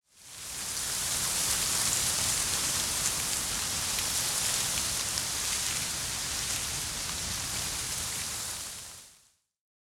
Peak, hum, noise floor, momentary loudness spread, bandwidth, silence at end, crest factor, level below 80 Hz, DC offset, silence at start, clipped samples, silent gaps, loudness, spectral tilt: -10 dBFS; none; -64 dBFS; 9 LU; 17.5 kHz; 0.75 s; 22 dB; -52 dBFS; under 0.1%; 0.15 s; under 0.1%; none; -29 LUFS; 0 dB/octave